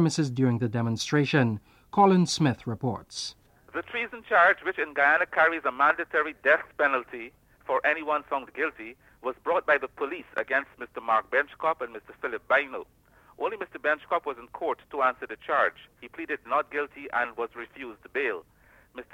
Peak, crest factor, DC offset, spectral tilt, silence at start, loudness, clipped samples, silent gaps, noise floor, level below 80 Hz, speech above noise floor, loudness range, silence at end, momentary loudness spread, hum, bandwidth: -6 dBFS; 20 dB; under 0.1%; -5.5 dB/octave; 0 s; -27 LUFS; under 0.1%; none; -46 dBFS; -64 dBFS; 19 dB; 6 LU; 0.1 s; 16 LU; none; 16 kHz